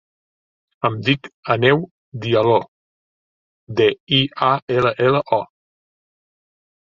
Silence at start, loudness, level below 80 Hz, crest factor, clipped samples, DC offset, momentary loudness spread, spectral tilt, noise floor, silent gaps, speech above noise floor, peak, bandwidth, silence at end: 0.85 s; -18 LUFS; -56 dBFS; 18 dB; under 0.1%; under 0.1%; 8 LU; -7 dB/octave; under -90 dBFS; 1.34-1.43 s, 1.91-2.12 s, 2.68-3.67 s, 4.00-4.07 s, 4.62-4.68 s; over 72 dB; -2 dBFS; 7.2 kHz; 1.4 s